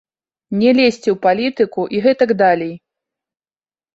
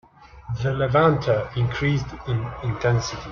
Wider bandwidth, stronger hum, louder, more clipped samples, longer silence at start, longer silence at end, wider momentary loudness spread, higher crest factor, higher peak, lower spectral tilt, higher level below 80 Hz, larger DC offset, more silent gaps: first, 8 kHz vs 7 kHz; neither; first, -15 LUFS vs -23 LUFS; neither; first, 0.5 s vs 0.2 s; first, 1.15 s vs 0 s; about the same, 7 LU vs 9 LU; about the same, 16 dB vs 18 dB; first, -2 dBFS vs -6 dBFS; about the same, -6 dB/octave vs -6.5 dB/octave; second, -60 dBFS vs -44 dBFS; neither; neither